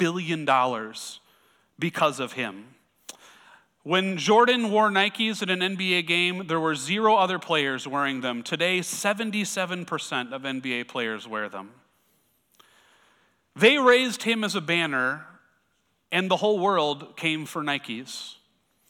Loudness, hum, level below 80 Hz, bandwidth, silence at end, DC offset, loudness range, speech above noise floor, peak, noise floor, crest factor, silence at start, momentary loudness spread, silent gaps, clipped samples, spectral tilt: -24 LUFS; none; -76 dBFS; 18 kHz; 0.55 s; under 0.1%; 8 LU; 46 dB; -6 dBFS; -71 dBFS; 20 dB; 0 s; 14 LU; none; under 0.1%; -3.5 dB/octave